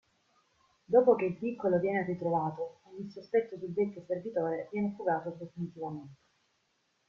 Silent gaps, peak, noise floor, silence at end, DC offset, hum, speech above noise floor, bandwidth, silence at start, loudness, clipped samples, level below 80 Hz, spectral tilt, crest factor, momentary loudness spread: none; -12 dBFS; -76 dBFS; 0.95 s; under 0.1%; none; 44 dB; 6.6 kHz; 0.9 s; -32 LUFS; under 0.1%; -74 dBFS; -9.5 dB/octave; 22 dB; 15 LU